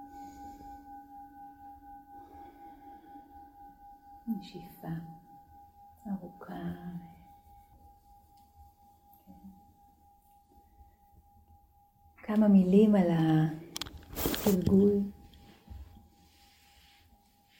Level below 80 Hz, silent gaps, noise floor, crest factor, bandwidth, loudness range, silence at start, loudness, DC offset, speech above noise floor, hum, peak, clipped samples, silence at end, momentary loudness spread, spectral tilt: -56 dBFS; none; -64 dBFS; 22 dB; 16.5 kHz; 23 LU; 0 s; -29 LUFS; under 0.1%; 37 dB; none; -12 dBFS; under 0.1%; 1.75 s; 28 LU; -7 dB/octave